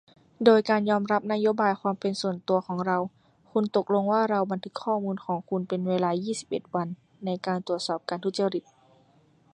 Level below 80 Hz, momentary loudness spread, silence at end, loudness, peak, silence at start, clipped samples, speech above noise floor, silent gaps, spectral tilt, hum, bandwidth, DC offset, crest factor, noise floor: -72 dBFS; 8 LU; 0.95 s; -27 LUFS; -4 dBFS; 0.4 s; under 0.1%; 35 dB; none; -6 dB/octave; none; 10.5 kHz; under 0.1%; 22 dB; -61 dBFS